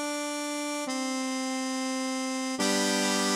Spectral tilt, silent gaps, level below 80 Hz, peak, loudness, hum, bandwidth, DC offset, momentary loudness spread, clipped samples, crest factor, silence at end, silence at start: -2.5 dB/octave; none; -76 dBFS; -14 dBFS; -29 LUFS; none; 16 kHz; under 0.1%; 6 LU; under 0.1%; 16 dB; 0 s; 0 s